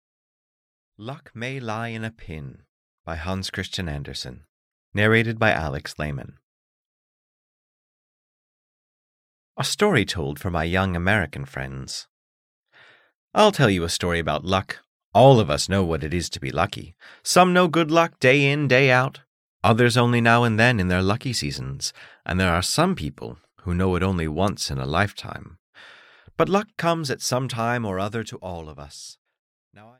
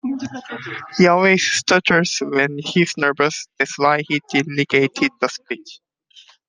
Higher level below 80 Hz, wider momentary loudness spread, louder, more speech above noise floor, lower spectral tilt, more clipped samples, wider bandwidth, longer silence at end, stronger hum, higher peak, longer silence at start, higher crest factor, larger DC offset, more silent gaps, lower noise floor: first, -46 dBFS vs -62 dBFS; first, 19 LU vs 15 LU; second, -22 LUFS vs -17 LUFS; about the same, 32 dB vs 31 dB; about the same, -5 dB/octave vs -4 dB/octave; neither; first, 16 kHz vs 10 kHz; first, 0.9 s vs 0.7 s; neither; about the same, -4 dBFS vs -2 dBFS; first, 1 s vs 0.05 s; about the same, 20 dB vs 18 dB; neither; first, 2.69-3.04 s, 4.49-4.92 s, 6.43-9.55 s, 12.09-12.64 s, 13.15-13.28 s, 14.87-15.12 s, 19.27-19.60 s, 25.59-25.73 s vs none; first, -54 dBFS vs -50 dBFS